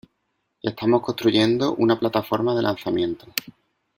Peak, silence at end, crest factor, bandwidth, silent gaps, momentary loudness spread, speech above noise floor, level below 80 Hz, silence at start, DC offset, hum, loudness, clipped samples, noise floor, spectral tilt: 0 dBFS; 0.45 s; 22 dB; 16.5 kHz; none; 11 LU; 53 dB; -60 dBFS; 0.65 s; under 0.1%; none; -22 LUFS; under 0.1%; -74 dBFS; -5.5 dB/octave